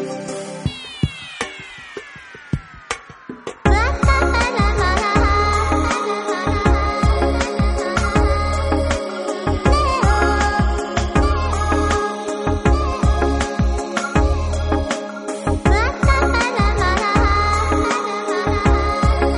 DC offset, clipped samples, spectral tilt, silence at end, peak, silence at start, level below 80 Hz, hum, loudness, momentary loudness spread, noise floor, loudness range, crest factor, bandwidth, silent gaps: under 0.1%; under 0.1%; -5.5 dB/octave; 0 s; 0 dBFS; 0 s; -22 dBFS; none; -19 LUFS; 12 LU; -38 dBFS; 3 LU; 18 dB; 10.5 kHz; none